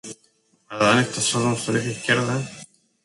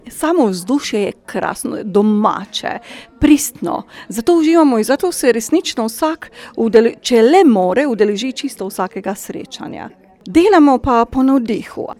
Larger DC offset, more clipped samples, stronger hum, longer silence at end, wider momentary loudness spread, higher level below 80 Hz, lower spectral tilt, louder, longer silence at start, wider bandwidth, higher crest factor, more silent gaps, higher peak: neither; neither; neither; first, 0.4 s vs 0.05 s; first, 19 LU vs 16 LU; second, -60 dBFS vs -44 dBFS; about the same, -4 dB/octave vs -4.5 dB/octave; second, -21 LUFS vs -14 LUFS; about the same, 0.05 s vs 0.05 s; second, 11.5 kHz vs 17 kHz; first, 20 dB vs 14 dB; neither; second, -4 dBFS vs 0 dBFS